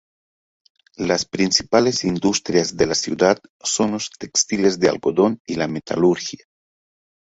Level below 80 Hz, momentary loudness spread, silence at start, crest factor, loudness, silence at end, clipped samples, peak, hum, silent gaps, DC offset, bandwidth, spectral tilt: -54 dBFS; 7 LU; 1 s; 18 dB; -19 LUFS; 0.85 s; under 0.1%; -2 dBFS; none; 3.49-3.60 s, 5.40-5.45 s; under 0.1%; 8.2 kHz; -3.5 dB/octave